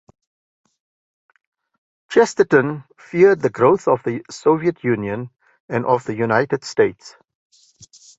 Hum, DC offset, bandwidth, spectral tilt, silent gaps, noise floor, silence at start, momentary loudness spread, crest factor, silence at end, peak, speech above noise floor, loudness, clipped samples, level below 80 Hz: none; under 0.1%; 8 kHz; -6 dB/octave; 5.60-5.68 s; -49 dBFS; 2.1 s; 12 LU; 20 dB; 1.1 s; 0 dBFS; 31 dB; -18 LUFS; under 0.1%; -60 dBFS